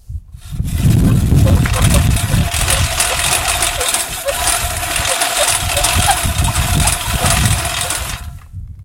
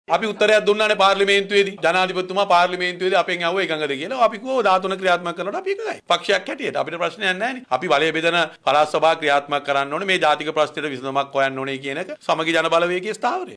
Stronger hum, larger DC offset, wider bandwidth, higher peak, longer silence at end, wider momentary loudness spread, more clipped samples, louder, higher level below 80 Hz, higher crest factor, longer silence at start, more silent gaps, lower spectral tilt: neither; neither; first, 17.5 kHz vs 11 kHz; first, 0 dBFS vs -6 dBFS; about the same, 0 s vs 0 s; first, 11 LU vs 8 LU; neither; first, -14 LUFS vs -20 LUFS; first, -22 dBFS vs -66 dBFS; about the same, 14 dB vs 14 dB; about the same, 0.1 s vs 0.1 s; neither; about the same, -3.5 dB/octave vs -3.5 dB/octave